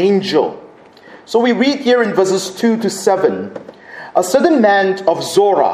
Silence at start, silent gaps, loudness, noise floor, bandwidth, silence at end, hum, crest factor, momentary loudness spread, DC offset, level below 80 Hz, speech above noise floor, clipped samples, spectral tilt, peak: 0 s; none; -14 LUFS; -40 dBFS; 15.5 kHz; 0 s; none; 14 dB; 11 LU; under 0.1%; -62 dBFS; 27 dB; under 0.1%; -4.5 dB/octave; 0 dBFS